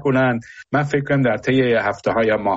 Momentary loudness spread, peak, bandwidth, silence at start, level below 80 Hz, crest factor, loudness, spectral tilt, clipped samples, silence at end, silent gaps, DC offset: 5 LU; -8 dBFS; 8 kHz; 0 s; -50 dBFS; 12 dB; -19 LUFS; -5.5 dB/octave; under 0.1%; 0 s; none; under 0.1%